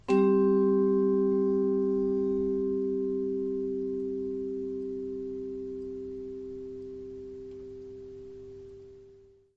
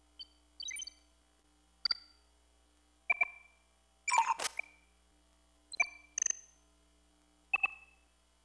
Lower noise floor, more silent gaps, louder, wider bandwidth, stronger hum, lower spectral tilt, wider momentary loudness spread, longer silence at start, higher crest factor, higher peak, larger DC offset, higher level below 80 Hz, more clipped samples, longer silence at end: second, -57 dBFS vs -70 dBFS; neither; first, -29 LUFS vs -35 LUFS; second, 5 kHz vs 11 kHz; neither; first, -9.5 dB/octave vs 2.5 dB/octave; about the same, 20 LU vs 20 LU; second, 0.05 s vs 0.2 s; second, 16 dB vs 24 dB; about the same, -14 dBFS vs -16 dBFS; neither; first, -60 dBFS vs -72 dBFS; neither; second, 0.4 s vs 0.65 s